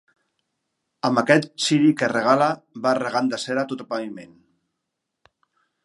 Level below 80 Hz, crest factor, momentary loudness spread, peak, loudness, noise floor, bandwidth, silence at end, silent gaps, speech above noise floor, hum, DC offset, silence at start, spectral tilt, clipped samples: -74 dBFS; 22 dB; 11 LU; -2 dBFS; -21 LUFS; -80 dBFS; 11.5 kHz; 1.6 s; none; 59 dB; none; under 0.1%; 1.05 s; -5 dB/octave; under 0.1%